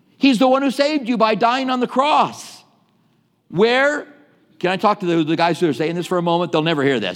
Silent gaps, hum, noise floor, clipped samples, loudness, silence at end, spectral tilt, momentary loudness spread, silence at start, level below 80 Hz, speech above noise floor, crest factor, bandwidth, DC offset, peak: none; none; -61 dBFS; under 0.1%; -18 LUFS; 0 s; -5.5 dB/octave; 7 LU; 0.2 s; -74 dBFS; 44 dB; 16 dB; 15.5 kHz; under 0.1%; -2 dBFS